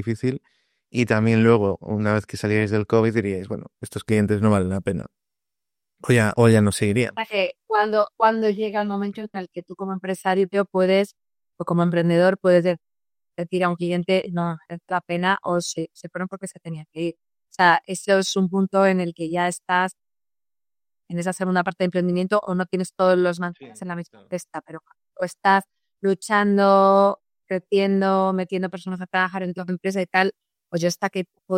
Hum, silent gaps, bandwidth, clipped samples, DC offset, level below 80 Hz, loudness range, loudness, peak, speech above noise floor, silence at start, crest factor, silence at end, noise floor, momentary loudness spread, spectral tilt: none; none; 15.5 kHz; under 0.1%; under 0.1%; -62 dBFS; 5 LU; -22 LUFS; -2 dBFS; over 69 dB; 0 s; 20 dB; 0 s; under -90 dBFS; 15 LU; -6 dB/octave